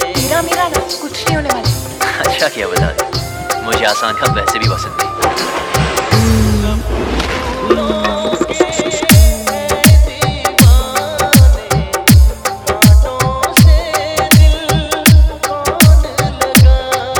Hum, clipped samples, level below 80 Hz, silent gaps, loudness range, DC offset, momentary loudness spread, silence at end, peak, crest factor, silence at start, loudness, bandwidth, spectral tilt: none; 0.4%; -16 dBFS; none; 4 LU; under 0.1%; 8 LU; 0 s; 0 dBFS; 12 dB; 0 s; -12 LUFS; over 20 kHz; -4.5 dB/octave